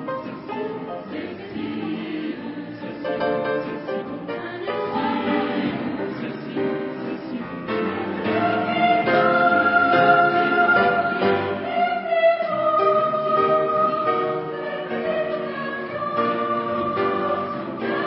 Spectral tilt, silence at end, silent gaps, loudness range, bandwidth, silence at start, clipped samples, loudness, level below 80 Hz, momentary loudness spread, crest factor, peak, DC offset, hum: -10.5 dB/octave; 0 s; none; 10 LU; 5.8 kHz; 0 s; under 0.1%; -22 LUFS; -58 dBFS; 13 LU; 18 dB; -4 dBFS; under 0.1%; none